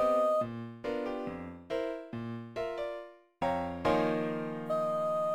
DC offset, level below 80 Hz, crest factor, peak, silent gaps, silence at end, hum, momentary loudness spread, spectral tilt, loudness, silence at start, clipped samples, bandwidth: under 0.1%; -62 dBFS; 18 dB; -16 dBFS; none; 0 s; none; 11 LU; -7 dB/octave; -34 LUFS; 0 s; under 0.1%; 17 kHz